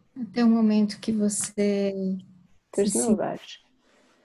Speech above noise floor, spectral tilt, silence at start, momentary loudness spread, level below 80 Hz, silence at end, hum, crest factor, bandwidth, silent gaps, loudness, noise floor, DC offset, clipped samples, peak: 38 dB; -5 dB/octave; 0.15 s; 12 LU; -64 dBFS; 0.7 s; none; 16 dB; 12.5 kHz; none; -25 LUFS; -62 dBFS; under 0.1%; under 0.1%; -10 dBFS